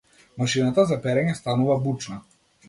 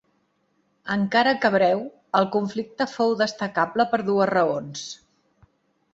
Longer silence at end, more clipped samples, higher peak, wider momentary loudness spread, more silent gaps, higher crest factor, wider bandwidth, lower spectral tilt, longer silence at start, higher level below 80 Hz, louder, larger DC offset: second, 0.5 s vs 1 s; neither; second, -8 dBFS vs -4 dBFS; about the same, 11 LU vs 13 LU; neither; about the same, 16 dB vs 20 dB; first, 11.5 kHz vs 8 kHz; about the same, -6 dB/octave vs -5 dB/octave; second, 0.35 s vs 0.85 s; first, -58 dBFS vs -66 dBFS; about the same, -23 LUFS vs -23 LUFS; neither